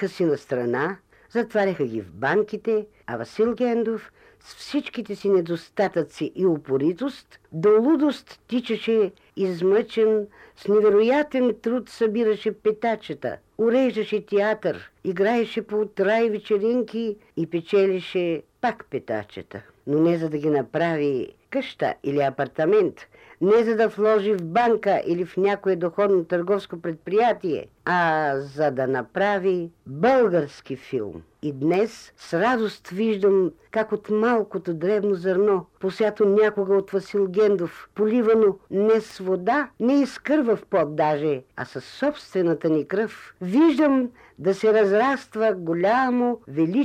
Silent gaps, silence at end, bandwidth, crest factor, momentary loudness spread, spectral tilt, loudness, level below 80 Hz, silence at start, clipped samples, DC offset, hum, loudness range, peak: none; 0 s; 9.8 kHz; 14 dB; 11 LU; -7 dB/octave; -23 LUFS; -64 dBFS; 0 s; under 0.1%; under 0.1%; none; 4 LU; -8 dBFS